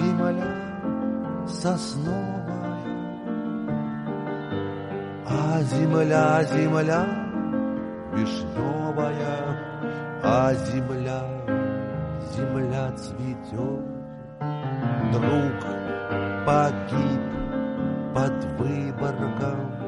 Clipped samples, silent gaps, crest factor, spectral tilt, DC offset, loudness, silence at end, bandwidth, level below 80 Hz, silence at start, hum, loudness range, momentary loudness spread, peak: under 0.1%; none; 18 dB; -7.5 dB/octave; under 0.1%; -26 LUFS; 0 s; 11 kHz; -50 dBFS; 0 s; none; 6 LU; 10 LU; -8 dBFS